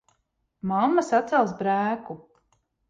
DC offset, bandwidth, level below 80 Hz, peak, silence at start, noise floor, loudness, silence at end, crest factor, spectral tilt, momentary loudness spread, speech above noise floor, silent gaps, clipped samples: under 0.1%; 9.4 kHz; -68 dBFS; -10 dBFS; 0.65 s; -74 dBFS; -24 LUFS; 0.75 s; 16 dB; -6.5 dB/octave; 15 LU; 50 dB; none; under 0.1%